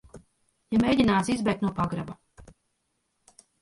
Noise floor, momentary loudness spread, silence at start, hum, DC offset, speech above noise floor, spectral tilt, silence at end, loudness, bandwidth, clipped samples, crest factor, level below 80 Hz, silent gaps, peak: -76 dBFS; 15 LU; 0.15 s; none; under 0.1%; 52 dB; -6 dB/octave; 1.2 s; -25 LUFS; 11.5 kHz; under 0.1%; 18 dB; -52 dBFS; none; -10 dBFS